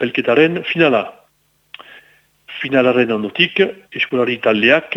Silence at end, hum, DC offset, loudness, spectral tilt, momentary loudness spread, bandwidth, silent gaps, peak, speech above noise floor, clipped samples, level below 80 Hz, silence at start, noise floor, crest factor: 0 s; none; under 0.1%; -15 LUFS; -6.5 dB/octave; 7 LU; 8 kHz; none; 0 dBFS; 45 dB; under 0.1%; -62 dBFS; 0 s; -60 dBFS; 16 dB